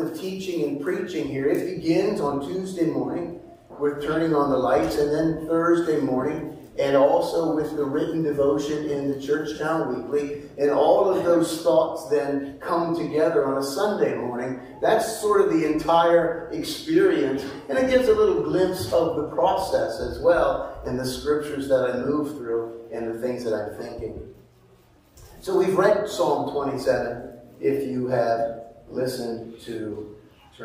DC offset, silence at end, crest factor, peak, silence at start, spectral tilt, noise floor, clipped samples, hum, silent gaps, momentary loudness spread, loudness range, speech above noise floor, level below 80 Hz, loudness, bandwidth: under 0.1%; 0 s; 18 dB; -6 dBFS; 0 s; -6 dB/octave; -55 dBFS; under 0.1%; none; none; 12 LU; 5 LU; 32 dB; -50 dBFS; -23 LUFS; 16 kHz